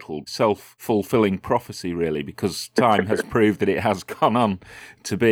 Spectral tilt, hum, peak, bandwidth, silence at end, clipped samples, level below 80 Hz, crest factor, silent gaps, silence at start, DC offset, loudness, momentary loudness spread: -5.5 dB/octave; none; -4 dBFS; 18.5 kHz; 0 s; under 0.1%; -54 dBFS; 18 dB; none; 0 s; under 0.1%; -22 LUFS; 11 LU